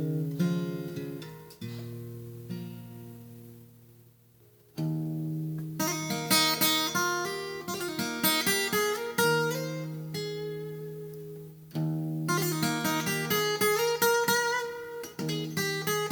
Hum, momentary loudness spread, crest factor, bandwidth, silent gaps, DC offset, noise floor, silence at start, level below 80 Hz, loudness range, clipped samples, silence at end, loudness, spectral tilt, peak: none; 18 LU; 20 dB; over 20 kHz; none; under 0.1%; -59 dBFS; 0 s; -68 dBFS; 14 LU; under 0.1%; 0 s; -29 LUFS; -3.5 dB/octave; -10 dBFS